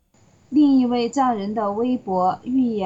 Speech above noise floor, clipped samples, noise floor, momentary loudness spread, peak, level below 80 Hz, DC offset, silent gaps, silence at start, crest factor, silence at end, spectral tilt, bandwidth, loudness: 36 dB; under 0.1%; -56 dBFS; 7 LU; -8 dBFS; -60 dBFS; under 0.1%; none; 0.5 s; 12 dB; 0 s; -6.5 dB/octave; 7.8 kHz; -20 LUFS